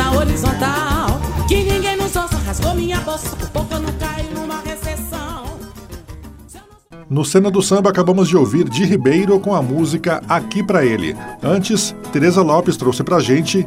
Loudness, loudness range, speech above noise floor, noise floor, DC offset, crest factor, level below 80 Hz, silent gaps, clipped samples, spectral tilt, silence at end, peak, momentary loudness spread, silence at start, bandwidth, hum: -17 LUFS; 10 LU; 26 dB; -41 dBFS; under 0.1%; 14 dB; -30 dBFS; none; under 0.1%; -5.5 dB/octave; 0 s; -2 dBFS; 12 LU; 0 s; 16 kHz; none